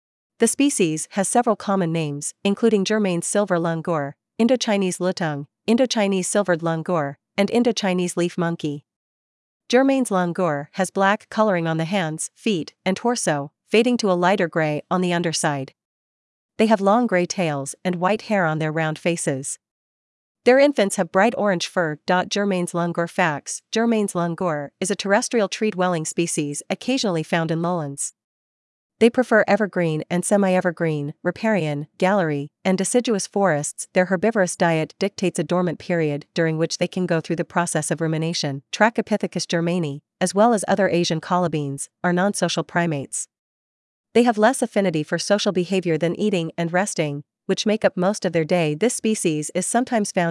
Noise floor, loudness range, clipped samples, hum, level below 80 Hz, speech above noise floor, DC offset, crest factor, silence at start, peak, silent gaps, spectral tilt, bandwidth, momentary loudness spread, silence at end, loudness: under -90 dBFS; 2 LU; under 0.1%; none; -72 dBFS; over 69 dB; under 0.1%; 20 dB; 0.4 s; -2 dBFS; 8.96-9.60 s, 15.85-16.49 s, 19.71-20.35 s, 28.24-28.90 s, 43.39-44.04 s; -4.5 dB/octave; 12 kHz; 7 LU; 0 s; -21 LUFS